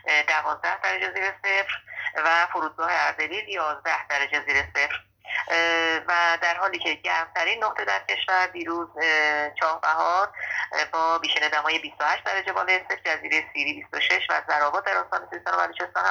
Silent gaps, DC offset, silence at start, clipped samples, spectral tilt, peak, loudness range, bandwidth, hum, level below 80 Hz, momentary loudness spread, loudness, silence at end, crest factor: none; under 0.1%; 0.05 s; under 0.1%; -1.5 dB/octave; -8 dBFS; 1 LU; over 20 kHz; none; -62 dBFS; 6 LU; -24 LUFS; 0 s; 18 dB